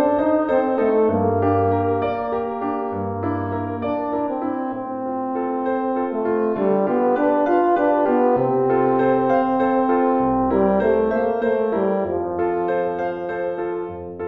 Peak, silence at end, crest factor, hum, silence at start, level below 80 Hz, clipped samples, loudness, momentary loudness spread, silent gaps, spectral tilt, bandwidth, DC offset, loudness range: -6 dBFS; 0 s; 14 dB; none; 0 s; -50 dBFS; under 0.1%; -20 LUFS; 7 LU; none; -10 dB/octave; 5 kHz; 0.1%; 6 LU